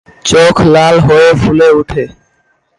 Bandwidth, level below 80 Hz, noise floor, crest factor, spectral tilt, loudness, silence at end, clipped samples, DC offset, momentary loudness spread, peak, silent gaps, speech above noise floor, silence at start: 11.5 kHz; -32 dBFS; -56 dBFS; 8 dB; -5.5 dB/octave; -7 LUFS; 0.7 s; under 0.1%; under 0.1%; 11 LU; 0 dBFS; none; 49 dB; 0.25 s